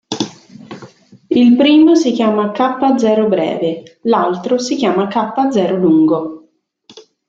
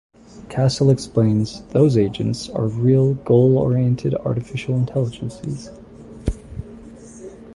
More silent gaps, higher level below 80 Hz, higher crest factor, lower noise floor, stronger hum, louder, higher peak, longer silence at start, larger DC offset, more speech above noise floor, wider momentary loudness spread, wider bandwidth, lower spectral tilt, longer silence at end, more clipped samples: neither; second, -60 dBFS vs -40 dBFS; about the same, 12 dB vs 16 dB; first, -52 dBFS vs -39 dBFS; neither; first, -13 LUFS vs -19 LUFS; about the same, -2 dBFS vs -2 dBFS; second, 0.1 s vs 0.35 s; neither; first, 39 dB vs 21 dB; second, 14 LU vs 20 LU; second, 7.8 kHz vs 11.5 kHz; second, -5.5 dB/octave vs -8 dB/octave; first, 0.3 s vs 0 s; neither